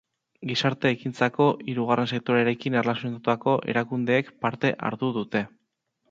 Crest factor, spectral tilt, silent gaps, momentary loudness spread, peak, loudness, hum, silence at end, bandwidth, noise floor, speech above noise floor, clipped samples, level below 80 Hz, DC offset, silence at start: 20 dB; -6.5 dB/octave; none; 6 LU; -6 dBFS; -25 LUFS; none; 0.65 s; 7.8 kHz; -76 dBFS; 51 dB; under 0.1%; -68 dBFS; under 0.1%; 0.4 s